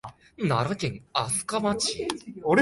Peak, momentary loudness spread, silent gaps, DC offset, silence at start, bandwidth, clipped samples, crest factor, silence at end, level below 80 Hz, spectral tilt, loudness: -8 dBFS; 7 LU; none; under 0.1%; 0.05 s; 11.5 kHz; under 0.1%; 20 dB; 0 s; -58 dBFS; -4 dB/octave; -27 LUFS